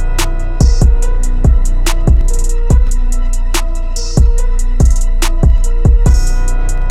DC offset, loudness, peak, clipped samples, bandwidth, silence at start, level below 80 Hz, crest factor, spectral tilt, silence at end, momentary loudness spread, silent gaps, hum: under 0.1%; -14 LUFS; 0 dBFS; under 0.1%; 13.5 kHz; 0 s; -10 dBFS; 8 dB; -5.5 dB/octave; 0 s; 7 LU; none; none